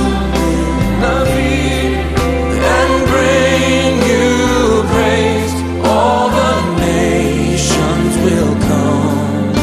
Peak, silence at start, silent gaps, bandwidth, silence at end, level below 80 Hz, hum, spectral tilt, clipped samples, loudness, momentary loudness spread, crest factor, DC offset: 0 dBFS; 0 s; none; 14 kHz; 0 s; -24 dBFS; none; -5 dB/octave; under 0.1%; -13 LUFS; 4 LU; 12 dB; under 0.1%